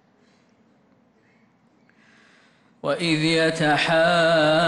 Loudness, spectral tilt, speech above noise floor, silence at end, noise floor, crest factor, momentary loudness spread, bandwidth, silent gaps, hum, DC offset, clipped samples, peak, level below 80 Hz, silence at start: -20 LUFS; -5 dB/octave; 41 dB; 0 s; -60 dBFS; 14 dB; 8 LU; 11.5 kHz; none; none; under 0.1%; under 0.1%; -10 dBFS; -62 dBFS; 2.85 s